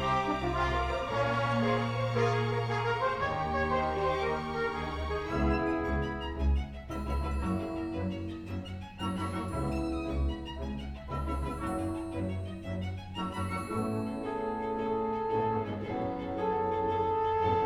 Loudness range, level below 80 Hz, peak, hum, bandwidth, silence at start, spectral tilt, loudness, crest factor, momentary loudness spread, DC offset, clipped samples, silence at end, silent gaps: 6 LU; -40 dBFS; -16 dBFS; none; 12.5 kHz; 0 s; -7 dB/octave; -33 LUFS; 16 dB; 8 LU; under 0.1%; under 0.1%; 0 s; none